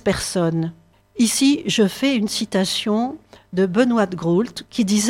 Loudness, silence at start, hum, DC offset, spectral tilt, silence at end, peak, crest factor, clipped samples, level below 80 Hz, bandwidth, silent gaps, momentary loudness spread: -20 LUFS; 0.05 s; none; under 0.1%; -4.5 dB/octave; 0 s; -4 dBFS; 16 dB; under 0.1%; -50 dBFS; 16.5 kHz; none; 9 LU